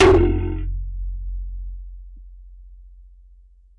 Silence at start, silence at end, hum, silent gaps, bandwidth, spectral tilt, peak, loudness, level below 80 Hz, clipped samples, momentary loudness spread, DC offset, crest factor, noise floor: 0 s; 0.7 s; 60 Hz at -55 dBFS; none; 10 kHz; -7 dB/octave; -6 dBFS; -23 LUFS; -28 dBFS; under 0.1%; 27 LU; under 0.1%; 16 dB; -49 dBFS